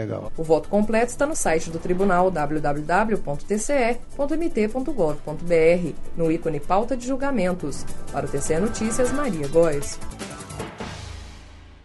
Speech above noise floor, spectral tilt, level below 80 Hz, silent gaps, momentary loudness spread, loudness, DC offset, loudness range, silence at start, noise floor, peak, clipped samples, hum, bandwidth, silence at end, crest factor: 22 dB; -5.5 dB/octave; -34 dBFS; none; 14 LU; -23 LUFS; under 0.1%; 3 LU; 0 s; -43 dBFS; -6 dBFS; under 0.1%; none; 11.5 kHz; 0.1 s; 16 dB